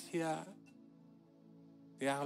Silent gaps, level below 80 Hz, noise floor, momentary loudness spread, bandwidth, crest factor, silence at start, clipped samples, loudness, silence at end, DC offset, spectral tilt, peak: none; under -90 dBFS; -63 dBFS; 24 LU; 16 kHz; 18 dB; 0 s; under 0.1%; -41 LUFS; 0 s; under 0.1%; -5 dB/octave; -24 dBFS